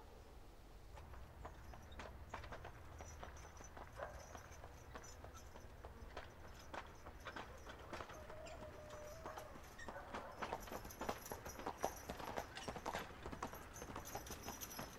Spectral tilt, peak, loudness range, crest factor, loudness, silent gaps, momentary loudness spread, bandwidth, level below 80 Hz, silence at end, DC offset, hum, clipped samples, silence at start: -4 dB/octave; -24 dBFS; 7 LU; 28 dB; -52 LUFS; none; 10 LU; 16 kHz; -62 dBFS; 0 s; under 0.1%; none; under 0.1%; 0 s